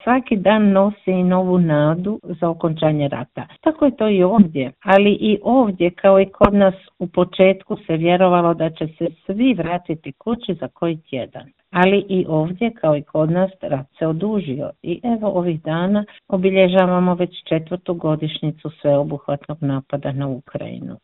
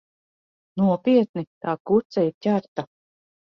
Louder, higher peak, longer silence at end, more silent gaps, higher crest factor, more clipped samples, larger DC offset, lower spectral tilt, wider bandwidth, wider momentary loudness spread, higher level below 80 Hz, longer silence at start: first, -18 LUFS vs -23 LUFS; first, 0 dBFS vs -8 dBFS; second, 0.1 s vs 0.6 s; second, none vs 1.29-1.34 s, 1.47-1.61 s, 1.80-1.85 s, 2.05-2.10 s, 2.34-2.41 s, 2.68-2.76 s; about the same, 18 dB vs 16 dB; neither; neither; about the same, -10 dB/octave vs -9 dB/octave; second, 4.1 kHz vs 6.4 kHz; about the same, 12 LU vs 14 LU; first, -48 dBFS vs -64 dBFS; second, 0.05 s vs 0.75 s